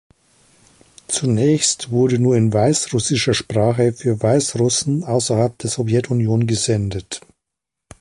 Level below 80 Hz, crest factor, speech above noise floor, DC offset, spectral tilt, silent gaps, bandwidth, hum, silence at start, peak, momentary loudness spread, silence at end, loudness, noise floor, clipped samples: -48 dBFS; 16 dB; 65 dB; under 0.1%; -5 dB/octave; none; 11.5 kHz; none; 1.1 s; -4 dBFS; 6 LU; 0.85 s; -18 LUFS; -82 dBFS; under 0.1%